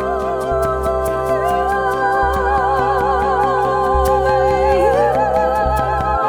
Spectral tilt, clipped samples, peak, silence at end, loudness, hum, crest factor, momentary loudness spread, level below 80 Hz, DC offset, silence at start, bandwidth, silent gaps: -6 dB/octave; under 0.1%; -2 dBFS; 0 s; -16 LUFS; none; 14 dB; 4 LU; -28 dBFS; under 0.1%; 0 s; over 20 kHz; none